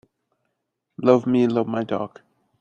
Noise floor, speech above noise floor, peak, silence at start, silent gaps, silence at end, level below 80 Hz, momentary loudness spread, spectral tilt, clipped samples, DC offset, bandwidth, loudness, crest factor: -78 dBFS; 58 dB; -2 dBFS; 1 s; none; 0.55 s; -66 dBFS; 11 LU; -8 dB/octave; under 0.1%; under 0.1%; 7.2 kHz; -21 LUFS; 22 dB